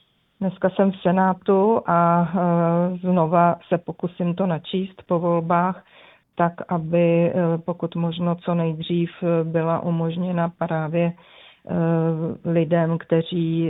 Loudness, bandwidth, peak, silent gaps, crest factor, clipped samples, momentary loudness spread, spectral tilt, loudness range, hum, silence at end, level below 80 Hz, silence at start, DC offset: -22 LUFS; 4 kHz; -4 dBFS; none; 18 dB; under 0.1%; 8 LU; -11.5 dB/octave; 4 LU; none; 0 s; -62 dBFS; 0.4 s; under 0.1%